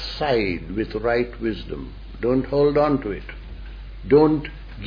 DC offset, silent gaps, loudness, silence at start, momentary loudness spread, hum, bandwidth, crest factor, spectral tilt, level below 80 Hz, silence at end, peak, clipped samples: under 0.1%; none; -21 LUFS; 0 s; 21 LU; none; 5.2 kHz; 18 dB; -8.5 dB/octave; -36 dBFS; 0 s; -4 dBFS; under 0.1%